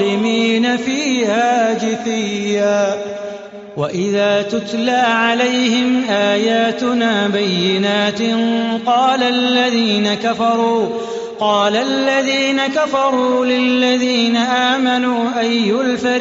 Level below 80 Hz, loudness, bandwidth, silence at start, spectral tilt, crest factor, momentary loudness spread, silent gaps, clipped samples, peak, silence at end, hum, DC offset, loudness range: -60 dBFS; -15 LUFS; 7.8 kHz; 0 s; -2.5 dB/octave; 14 dB; 5 LU; none; under 0.1%; -2 dBFS; 0 s; none; under 0.1%; 3 LU